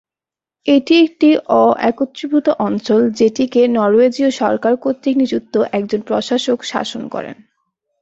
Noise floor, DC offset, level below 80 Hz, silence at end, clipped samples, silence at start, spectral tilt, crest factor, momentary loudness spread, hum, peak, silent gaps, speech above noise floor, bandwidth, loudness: -89 dBFS; under 0.1%; -58 dBFS; 0.7 s; under 0.1%; 0.65 s; -5 dB/octave; 14 dB; 10 LU; none; -2 dBFS; none; 74 dB; 8 kHz; -15 LUFS